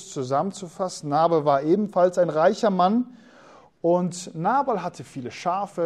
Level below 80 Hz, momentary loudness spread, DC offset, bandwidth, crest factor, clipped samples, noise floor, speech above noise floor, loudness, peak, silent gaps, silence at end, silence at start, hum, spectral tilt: -70 dBFS; 11 LU; under 0.1%; 12 kHz; 16 dB; under 0.1%; -51 dBFS; 28 dB; -23 LUFS; -8 dBFS; none; 0 s; 0 s; none; -6 dB/octave